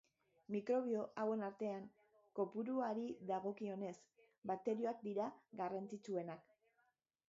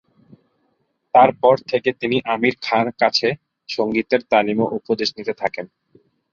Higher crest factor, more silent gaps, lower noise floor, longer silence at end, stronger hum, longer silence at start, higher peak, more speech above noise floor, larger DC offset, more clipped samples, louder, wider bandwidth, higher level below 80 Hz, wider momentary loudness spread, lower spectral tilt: about the same, 16 dB vs 20 dB; first, 4.38-4.42 s vs none; first, -83 dBFS vs -68 dBFS; first, 0.9 s vs 0.65 s; neither; second, 0.5 s vs 1.15 s; second, -28 dBFS vs 0 dBFS; second, 40 dB vs 50 dB; neither; neither; second, -44 LUFS vs -19 LUFS; about the same, 7.4 kHz vs 7.4 kHz; second, -90 dBFS vs -60 dBFS; about the same, 11 LU vs 11 LU; first, -6.5 dB/octave vs -5 dB/octave